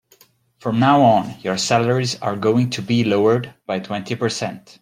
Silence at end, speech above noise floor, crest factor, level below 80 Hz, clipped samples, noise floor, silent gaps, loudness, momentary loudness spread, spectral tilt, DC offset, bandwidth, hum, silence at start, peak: 0.2 s; 36 dB; 18 dB; -58 dBFS; under 0.1%; -55 dBFS; none; -19 LUFS; 12 LU; -5.5 dB/octave; under 0.1%; 15.5 kHz; none; 0.65 s; -2 dBFS